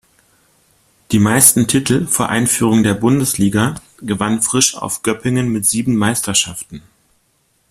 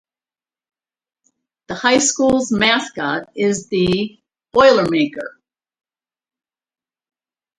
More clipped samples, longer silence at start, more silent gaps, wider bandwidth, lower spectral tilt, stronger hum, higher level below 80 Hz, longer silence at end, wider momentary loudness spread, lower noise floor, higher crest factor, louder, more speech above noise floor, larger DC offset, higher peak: neither; second, 1.1 s vs 1.7 s; neither; first, 16 kHz vs 11 kHz; about the same, -3.5 dB/octave vs -3.5 dB/octave; neither; about the same, -48 dBFS vs -52 dBFS; second, 0.9 s vs 2.3 s; about the same, 11 LU vs 12 LU; second, -61 dBFS vs under -90 dBFS; about the same, 16 dB vs 20 dB; about the same, -14 LUFS vs -16 LUFS; second, 46 dB vs over 74 dB; neither; about the same, 0 dBFS vs 0 dBFS